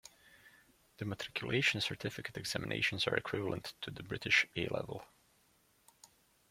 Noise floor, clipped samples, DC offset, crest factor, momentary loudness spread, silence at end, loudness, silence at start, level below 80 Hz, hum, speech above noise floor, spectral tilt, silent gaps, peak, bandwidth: -71 dBFS; under 0.1%; under 0.1%; 24 dB; 15 LU; 0.45 s; -36 LUFS; 0.25 s; -66 dBFS; none; 34 dB; -4 dB/octave; none; -14 dBFS; 16.5 kHz